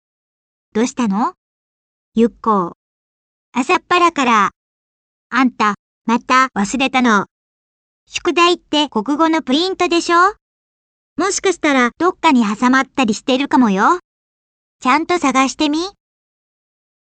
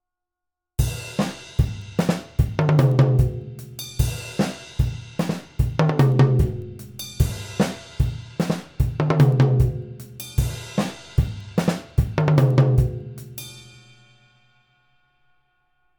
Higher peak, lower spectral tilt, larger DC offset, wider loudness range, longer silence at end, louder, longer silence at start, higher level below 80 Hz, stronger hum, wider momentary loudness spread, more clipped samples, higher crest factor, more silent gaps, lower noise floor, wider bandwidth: about the same, -2 dBFS vs -4 dBFS; second, -3.5 dB/octave vs -7 dB/octave; neither; about the same, 3 LU vs 1 LU; second, 1.15 s vs 2.35 s; first, -15 LUFS vs -22 LUFS; about the same, 0.75 s vs 0.8 s; second, -56 dBFS vs -32 dBFS; neither; second, 8 LU vs 17 LU; neither; about the same, 16 dB vs 18 dB; first, 1.37-2.12 s, 2.75-3.52 s, 4.56-5.30 s, 5.79-6.05 s, 7.31-8.07 s, 10.41-11.16 s, 14.04-14.79 s vs none; first, under -90 dBFS vs -84 dBFS; second, 9.4 kHz vs over 20 kHz